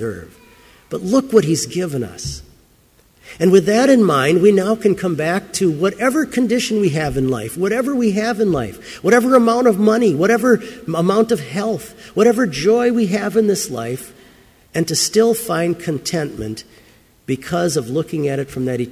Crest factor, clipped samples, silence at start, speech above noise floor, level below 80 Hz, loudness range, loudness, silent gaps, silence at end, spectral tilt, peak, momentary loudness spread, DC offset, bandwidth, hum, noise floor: 16 dB; under 0.1%; 0 s; 37 dB; -48 dBFS; 5 LU; -17 LUFS; none; 0 s; -5 dB/octave; 0 dBFS; 13 LU; under 0.1%; 16 kHz; none; -53 dBFS